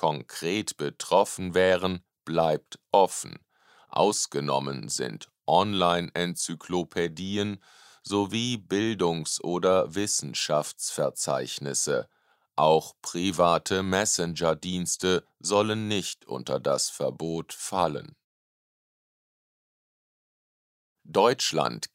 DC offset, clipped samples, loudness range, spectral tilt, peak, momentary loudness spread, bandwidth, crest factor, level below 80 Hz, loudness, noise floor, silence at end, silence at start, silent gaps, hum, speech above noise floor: under 0.1%; under 0.1%; 5 LU; -3.5 dB/octave; -6 dBFS; 9 LU; 16 kHz; 20 dB; -64 dBFS; -27 LUFS; under -90 dBFS; 0.1 s; 0 s; 18.24-20.96 s; none; over 63 dB